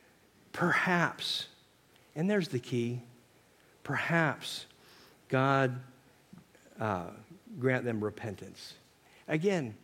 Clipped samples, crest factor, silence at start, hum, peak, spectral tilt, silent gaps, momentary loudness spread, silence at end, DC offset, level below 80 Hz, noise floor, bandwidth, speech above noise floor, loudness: under 0.1%; 22 dB; 0.55 s; none; -12 dBFS; -5.5 dB/octave; none; 19 LU; 0.05 s; under 0.1%; -74 dBFS; -63 dBFS; 16.5 kHz; 32 dB; -32 LUFS